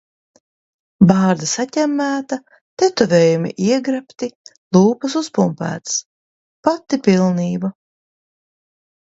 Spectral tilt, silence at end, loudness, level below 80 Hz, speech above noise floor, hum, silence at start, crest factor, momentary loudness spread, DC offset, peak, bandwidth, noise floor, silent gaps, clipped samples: -5.5 dB/octave; 1.3 s; -17 LUFS; -56 dBFS; over 74 dB; none; 1 s; 18 dB; 11 LU; under 0.1%; 0 dBFS; 8 kHz; under -90 dBFS; 2.61-2.77 s, 4.35-4.45 s, 4.58-4.71 s, 6.05-6.63 s; under 0.1%